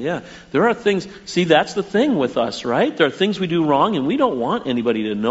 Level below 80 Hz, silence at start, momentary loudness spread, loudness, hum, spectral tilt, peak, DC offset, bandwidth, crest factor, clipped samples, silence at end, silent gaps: -56 dBFS; 0 s; 6 LU; -19 LUFS; none; -4 dB/octave; 0 dBFS; under 0.1%; 8 kHz; 18 dB; under 0.1%; 0 s; none